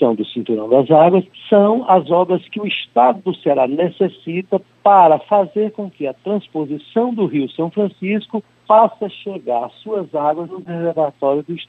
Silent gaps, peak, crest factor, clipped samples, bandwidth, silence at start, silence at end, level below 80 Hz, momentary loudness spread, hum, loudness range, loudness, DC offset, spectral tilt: none; 0 dBFS; 16 dB; under 0.1%; 4.2 kHz; 0 s; 0.05 s; -68 dBFS; 13 LU; none; 4 LU; -16 LUFS; under 0.1%; -9 dB/octave